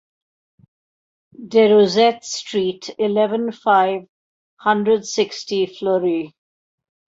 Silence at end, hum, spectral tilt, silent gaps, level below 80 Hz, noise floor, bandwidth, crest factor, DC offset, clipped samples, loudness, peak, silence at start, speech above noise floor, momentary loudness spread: 0.9 s; none; -4.5 dB/octave; 4.09-4.57 s; -66 dBFS; under -90 dBFS; 7.8 kHz; 16 dB; under 0.1%; under 0.1%; -18 LUFS; -4 dBFS; 1.4 s; over 72 dB; 11 LU